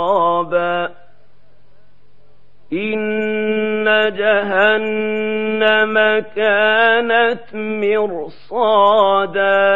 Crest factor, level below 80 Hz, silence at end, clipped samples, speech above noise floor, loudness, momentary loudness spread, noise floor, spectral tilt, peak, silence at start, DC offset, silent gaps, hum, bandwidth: 16 dB; -62 dBFS; 0 s; under 0.1%; 40 dB; -15 LUFS; 10 LU; -55 dBFS; -6.5 dB/octave; 0 dBFS; 0 s; 2%; none; none; 5 kHz